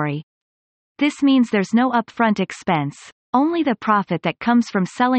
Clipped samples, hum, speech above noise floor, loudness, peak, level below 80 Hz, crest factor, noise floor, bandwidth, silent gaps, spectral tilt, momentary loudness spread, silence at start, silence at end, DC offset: under 0.1%; none; over 71 dB; -19 LUFS; -6 dBFS; -62 dBFS; 14 dB; under -90 dBFS; 8.8 kHz; 0.23-0.95 s, 3.12-3.33 s; -6 dB/octave; 6 LU; 0 s; 0 s; under 0.1%